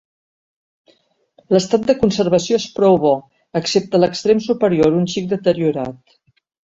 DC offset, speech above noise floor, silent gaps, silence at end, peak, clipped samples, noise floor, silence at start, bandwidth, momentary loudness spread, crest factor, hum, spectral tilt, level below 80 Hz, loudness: under 0.1%; 42 dB; none; 0.8 s; 0 dBFS; under 0.1%; -58 dBFS; 1.5 s; 8 kHz; 7 LU; 16 dB; none; -6 dB/octave; -52 dBFS; -17 LUFS